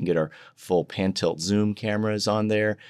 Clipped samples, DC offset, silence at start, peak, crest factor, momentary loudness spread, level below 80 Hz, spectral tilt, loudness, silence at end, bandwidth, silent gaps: under 0.1%; under 0.1%; 0 s; -10 dBFS; 14 dB; 3 LU; -66 dBFS; -5.5 dB/octave; -25 LUFS; 0 s; 13.5 kHz; none